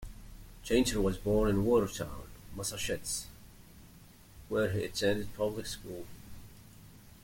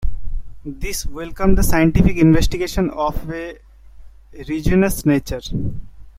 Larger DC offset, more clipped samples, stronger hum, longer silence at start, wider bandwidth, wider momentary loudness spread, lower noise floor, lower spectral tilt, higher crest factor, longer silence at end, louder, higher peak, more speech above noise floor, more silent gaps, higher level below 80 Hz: neither; neither; neither; about the same, 0 s vs 0 s; about the same, 17 kHz vs 16 kHz; first, 23 LU vs 19 LU; first, -56 dBFS vs -39 dBFS; second, -4.5 dB/octave vs -6 dB/octave; about the same, 20 dB vs 16 dB; about the same, 0.1 s vs 0.1 s; second, -32 LUFS vs -19 LUFS; second, -14 dBFS vs -2 dBFS; about the same, 24 dB vs 23 dB; neither; second, -48 dBFS vs -24 dBFS